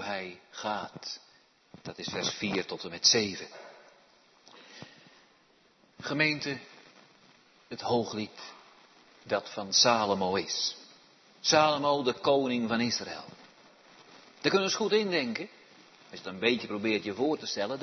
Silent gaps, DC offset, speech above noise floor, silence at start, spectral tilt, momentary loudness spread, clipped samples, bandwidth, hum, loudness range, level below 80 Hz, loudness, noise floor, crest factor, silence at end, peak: none; under 0.1%; 35 dB; 0 s; -3 dB/octave; 22 LU; under 0.1%; 6.4 kHz; none; 8 LU; -74 dBFS; -29 LUFS; -64 dBFS; 24 dB; 0 s; -8 dBFS